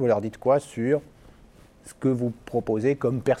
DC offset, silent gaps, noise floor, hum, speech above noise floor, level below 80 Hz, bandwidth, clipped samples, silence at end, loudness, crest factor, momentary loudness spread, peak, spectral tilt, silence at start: under 0.1%; none; -52 dBFS; none; 28 dB; -56 dBFS; 13.5 kHz; under 0.1%; 0 s; -25 LUFS; 16 dB; 5 LU; -8 dBFS; -8 dB/octave; 0 s